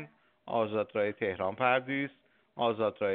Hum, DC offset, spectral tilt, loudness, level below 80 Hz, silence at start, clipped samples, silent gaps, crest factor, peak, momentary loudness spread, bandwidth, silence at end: none; under 0.1%; -3.5 dB/octave; -32 LUFS; -76 dBFS; 0 s; under 0.1%; none; 20 dB; -12 dBFS; 9 LU; 4.3 kHz; 0 s